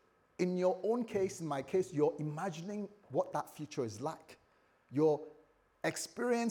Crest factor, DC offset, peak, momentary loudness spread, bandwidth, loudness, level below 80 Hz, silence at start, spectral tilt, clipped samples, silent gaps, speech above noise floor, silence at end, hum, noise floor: 18 dB; under 0.1%; -18 dBFS; 11 LU; 20 kHz; -37 LUFS; -78 dBFS; 0.4 s; -6 dB/octave; under 0.1%; none; 31 dB; 0 s; none; -67 dBFS